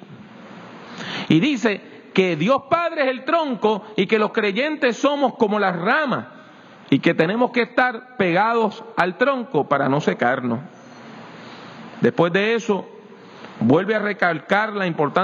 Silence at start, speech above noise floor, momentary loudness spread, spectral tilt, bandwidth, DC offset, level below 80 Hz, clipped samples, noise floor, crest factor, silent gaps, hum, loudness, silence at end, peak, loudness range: 0.1 s; 25 dB; 20 LU; -6 dB/octave; 7.6 kHz; under 0.1%; -68 dBFS; under 0.1%; -44 dBFS; 18 dB; none; none; -20 LUFS; 0 s; -2 dBFS; 3 LU